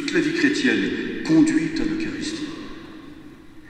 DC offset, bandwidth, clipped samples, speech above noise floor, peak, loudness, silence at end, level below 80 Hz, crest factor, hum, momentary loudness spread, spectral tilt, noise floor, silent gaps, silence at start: under 0.1%; 9.8 kHz; under 0.1%; 21 dB; -6 dBFS; -21 LUFS; 0 s; -46 dBFS; 16 dB; none; 22 LU; -4.5 dB/octave; -42 dBFS; none; 0 s